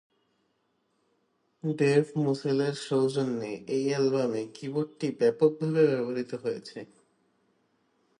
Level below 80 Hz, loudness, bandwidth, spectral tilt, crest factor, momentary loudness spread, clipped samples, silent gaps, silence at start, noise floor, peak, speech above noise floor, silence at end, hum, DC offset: -78 dBFS; -28 LUFS; 11 kHz; -6.5 dB/octave; 18 dB; 10 LU; under 0.1%; none; 1.65 s; -74 dBFS; -10 dBFS; 47 dB; 1.35 s; none; under 0.1%